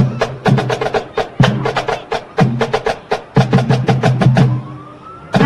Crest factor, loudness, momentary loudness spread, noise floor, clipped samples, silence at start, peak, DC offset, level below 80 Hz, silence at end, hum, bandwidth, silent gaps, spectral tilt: 14 dB; -15 LUFS; 10 LU; -34 dBFS; under 0.1%; 0 s; 0 dBFS; under 0.1%; -40 dBFS; 0 s; none; 10.5 kHz; none; -7 dB/octave